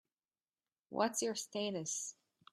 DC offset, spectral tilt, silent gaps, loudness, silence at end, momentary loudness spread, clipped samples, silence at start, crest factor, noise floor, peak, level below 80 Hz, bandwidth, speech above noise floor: under 0.1%; -2.5 dB/octave; none; -39 LUFS; 0.4 s; 9 LU; under 0.1%; 0.9 s; 22 dB; under -90 dBFS; -20 dBFS; -86 dBFS; 15.5 kHz; over 51 dB